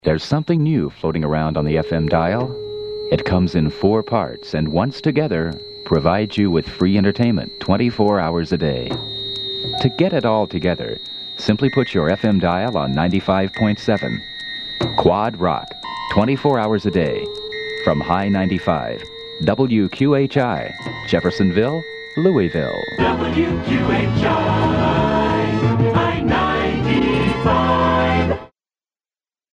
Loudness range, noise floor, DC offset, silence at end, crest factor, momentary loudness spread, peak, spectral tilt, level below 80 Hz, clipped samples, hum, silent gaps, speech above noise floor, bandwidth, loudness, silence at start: 2 LU; under -90 dBFS; under 0.1%; 1.05 s; 18 dB; 8 LU; 0 dBFS; -7.5 dB/octave; -38 dBFS; under 0.1%; none; none; over 72 dB; 9.6 kHz; -19 LUFS; 0.05 s